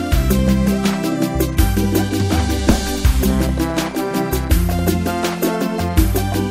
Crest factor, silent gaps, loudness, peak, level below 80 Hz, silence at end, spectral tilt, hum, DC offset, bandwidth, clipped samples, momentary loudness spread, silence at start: 16 dB; none; -18 LUFS; 0 dBFS; -22 dBFS; 0 s; -5.5 dB/octave; none; under 0.1%; 16.5 kHz; under 0.1%; 4 LU; 0 s